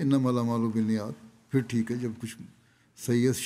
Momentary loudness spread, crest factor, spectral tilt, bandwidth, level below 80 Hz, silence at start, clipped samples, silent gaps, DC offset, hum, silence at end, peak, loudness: 15 LU; 16 dB; -6.5 dB/octave; 15.5 kHz; -70 dBFS; 0 s; under 0.1%; none; under 0.1%; none; 0 s; -12 dBFS; -29 LUFS